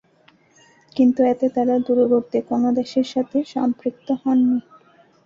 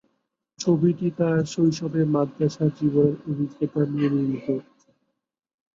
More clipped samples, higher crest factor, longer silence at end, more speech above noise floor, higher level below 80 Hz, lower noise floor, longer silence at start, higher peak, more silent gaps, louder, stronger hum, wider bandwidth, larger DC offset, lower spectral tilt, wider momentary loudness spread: neither; about the same, 14 dB vs 18 dB; second, 0.65 s vs 1.15 s; second, 37 dB vs 57 dB; about the same, -64 dBFS vs -64 dBFS; second, -56 dBFS vs -79 dBFS; first, 0.95 s vs 0.6 s; about the same, -6 dBFS vs -6 dBFS; neither; first, -20 LUFS vs -24 LUFS; neither; about the same, 7.2 kHz vs 7.6 kHz; neither; about the same, -7 dB/octave vs -7.5 dB/octave; about the same, 7 LU vs 7 LU